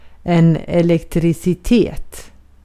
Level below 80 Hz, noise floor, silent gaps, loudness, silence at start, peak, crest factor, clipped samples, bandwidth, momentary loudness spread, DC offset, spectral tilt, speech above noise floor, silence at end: -34 dBFS; -37 dBFS; none; -16 LUFS; 0.05 s; -2 dBFS; 14 dB; under 0.1%; 14.5 kHz; 7 LU; under 0.1%; -7.5 dB/octave; 23 dB; 0.35 s